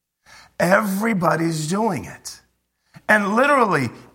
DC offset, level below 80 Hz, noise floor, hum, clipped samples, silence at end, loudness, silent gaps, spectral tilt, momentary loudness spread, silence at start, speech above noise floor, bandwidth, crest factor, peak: under 0.1%; -60 dBFS; -67 dBFS; none; under 0.1%; 0.1 s; -19 LUFS; none; -5.5 dB/octave; 18 LU; 0.6 s; 48 dB; 16.5 kHz; 20 dB; 0 dBFS